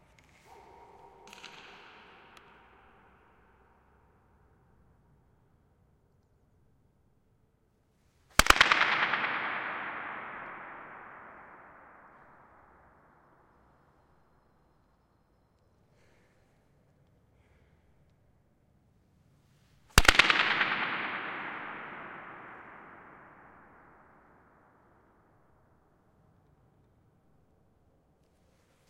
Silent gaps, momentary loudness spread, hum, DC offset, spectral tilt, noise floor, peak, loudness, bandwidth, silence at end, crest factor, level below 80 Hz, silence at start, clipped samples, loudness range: none; 31 LU; none; under 0.1%; -2 dB/octave; -70 dBFS; -2 dBFS; -27 LUFS; 16 kHz; 5.9 s; 34 dB; -48 dBFS; 1.25 s; under 0.1%; 26 LU